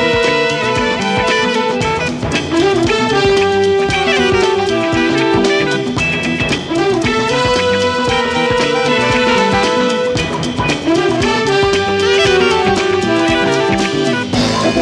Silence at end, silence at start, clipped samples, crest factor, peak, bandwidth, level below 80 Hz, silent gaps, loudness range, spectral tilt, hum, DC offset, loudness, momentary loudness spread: 0 s; 0 s; under 0.1%; 12 dB; -2 dBFS; 11.5 kHz; -36 dBFS; none; 1 LU; -4.5 dB/octave; none; under 0.1%; -13 LUFS; 4 LU